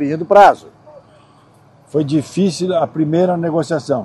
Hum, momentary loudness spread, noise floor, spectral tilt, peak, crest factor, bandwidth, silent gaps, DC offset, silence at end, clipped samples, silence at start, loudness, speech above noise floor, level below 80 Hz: none; 10 LU; -48 dBFS; -6.5 dB/octave; 0 dBFS; 16 dB; 12 kHz; none; under 0.1%; 0 s; 0.1%; 0 s; -15 LUFS; 34 dB; -56 dBFS